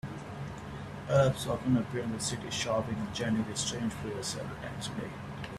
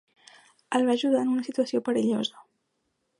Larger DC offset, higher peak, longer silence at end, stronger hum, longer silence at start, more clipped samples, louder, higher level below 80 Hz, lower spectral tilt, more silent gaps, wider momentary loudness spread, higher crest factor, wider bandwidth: neither; about the same, -14 dBFS vs -12 dBFS; second, 0 s vs 0.8 s; neither; second, 0.05 s vs 0.7 s; neither; second, -33 LUFS vs -26 LUFS; first, -54 dBFS vs -78 dBFS; about the same, -5 dB/octave vs -5 dB/octave; neither; first, 13 LU vs 6 LU; about the same, 20 dB vs 16 dB; first, 14 kHz vs 11 kHz